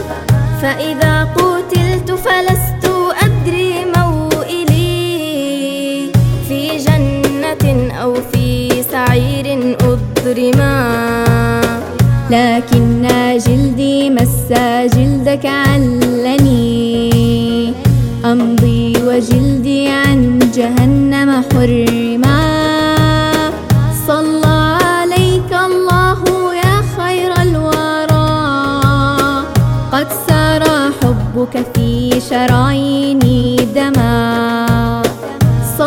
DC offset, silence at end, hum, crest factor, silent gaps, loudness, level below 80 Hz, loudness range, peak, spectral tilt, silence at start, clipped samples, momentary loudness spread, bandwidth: under 0.1%; 0 s; none; 12 dB; none; -12 LUFS; -28 dBFS; 3 LU; 0 dBFS; -6 dB/octave; 0 s; under 0.1%; 4 LU; 17 kHz